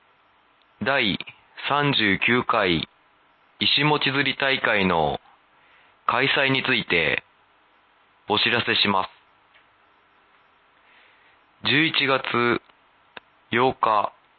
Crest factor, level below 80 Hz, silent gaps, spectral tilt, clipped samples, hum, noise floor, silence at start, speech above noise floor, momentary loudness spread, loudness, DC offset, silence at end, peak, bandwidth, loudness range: 18 dB; -56 dBFS; none; -8.5 dB/octave; under 0.1%; none; -60 dBFS; 0.8 s; 39 dB; 9 LU; -21 LUFS; under 0.1%; 0.3 s; -6 dBFS; 5.6 kHz; 4 LU